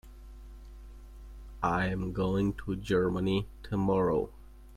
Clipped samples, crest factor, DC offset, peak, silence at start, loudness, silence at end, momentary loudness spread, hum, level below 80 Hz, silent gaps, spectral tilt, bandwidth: under 0.1%; 16 dB; under 0.1%; -16 dBFS; 0.05 s; -31 LUFS; 0 s; 23 LU; none; -46 dBFS; none; -7.5 dB/octave; 13 kHz